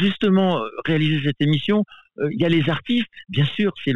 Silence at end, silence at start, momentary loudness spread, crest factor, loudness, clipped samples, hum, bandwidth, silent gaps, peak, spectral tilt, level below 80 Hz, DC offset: 0 s; 0 s; 7 LU; 12 dB; -21 LUFS; under 0.1%; none; 6.8 kHz; none; -8 dBFS; -8 dB/octave; -56 dBFS; 0.6%